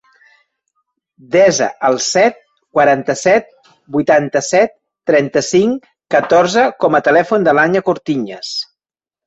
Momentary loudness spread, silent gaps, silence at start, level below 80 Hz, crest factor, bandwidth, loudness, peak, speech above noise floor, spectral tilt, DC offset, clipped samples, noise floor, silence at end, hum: 9 LU; none; 1.3 s; -58 dBFS; 14 dB; 8.2 kHz; -14 LUFS; 0 dBFS; 76 dB; -4 dB/octave; under 0.1%; under 0.1%; -89 dBFS; 0.65 s; none